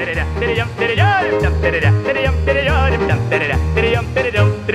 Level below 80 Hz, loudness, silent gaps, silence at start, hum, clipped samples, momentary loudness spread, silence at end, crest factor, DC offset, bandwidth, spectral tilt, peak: -24 dBFS; -16 LUFS; none; 0 s; none; under 0.1%; 4 LU; 0 s; 14 dB; 0.1%; 11.5 kHz; -6.5 dB/octave; -2 dBFS